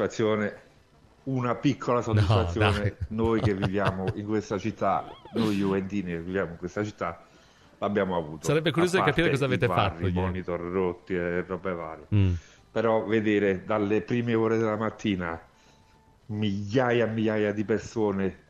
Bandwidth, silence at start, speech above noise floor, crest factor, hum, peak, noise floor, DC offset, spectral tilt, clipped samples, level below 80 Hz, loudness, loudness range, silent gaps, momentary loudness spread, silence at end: 12.5 kHz; 0 s; 32 dB; 18 dB; none; -8 dBFS; -59 dBFS; under 0.1%; -7 dB/octave; under 0.1%; -50 dBFS; -27 LUFS; 3 LU; none; 9 LU; 0.15 s